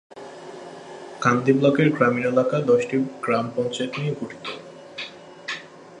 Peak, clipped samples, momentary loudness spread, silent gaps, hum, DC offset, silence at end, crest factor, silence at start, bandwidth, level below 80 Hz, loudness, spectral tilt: -2 dBFS; under 0.1%; 20 LU; none; none; under 0.1%; 0 s; 20 dB; 0.15 s; 10.5 kHz; -66 dBFS; -22 LUFS; -6.5 dB/octave